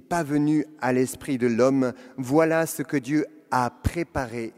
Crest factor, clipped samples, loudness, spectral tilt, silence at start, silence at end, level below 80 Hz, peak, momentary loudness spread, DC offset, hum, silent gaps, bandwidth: 18 dB; under 0.1%; -24 LUFS; -6 dB/octave; 0.1 s; 0.1 s; -46 dBFS; -6 dBFS; 8 LU; under 0.1%; none; none; 16 kHz